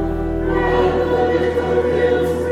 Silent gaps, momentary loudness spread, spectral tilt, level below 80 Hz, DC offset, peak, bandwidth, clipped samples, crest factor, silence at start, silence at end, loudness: none; 4 LU; -7.5 dB/octave; -30 dBFS; under 0.1%; -6 dBFS; 13.5 kHz; under 0.1%; 12 dB; 0 s; 0 s; -17 LUFS